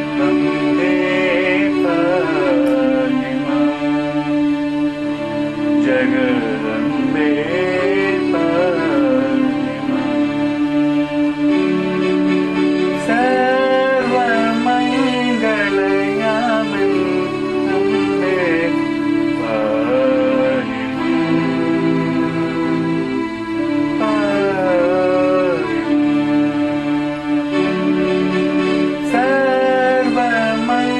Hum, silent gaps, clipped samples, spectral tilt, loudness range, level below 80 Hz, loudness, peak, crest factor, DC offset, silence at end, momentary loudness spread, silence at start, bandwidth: none; none; under 0.1%; -6.5 dB/octave; 2 LU; -48 dBFS; -16 LUFS; -2 dBFS; 14 dB; under 0.1%; 0 s; 4 LU; 0 s; 9.6 kHz